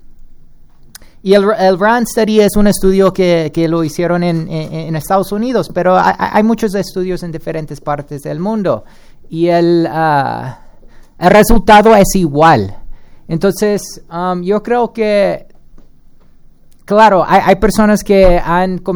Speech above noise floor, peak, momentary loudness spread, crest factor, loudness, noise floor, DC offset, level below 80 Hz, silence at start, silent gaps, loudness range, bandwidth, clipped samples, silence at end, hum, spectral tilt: 28 dB; 0 dBFS; 13 LU; 12 dB; -12 LUFS; -39 dBFS; under 0.1%; -26 dBFS; 0.05 s; none; 6 LU; over 20 kHz; 0.4%; 0 s; none; -6 dB/octave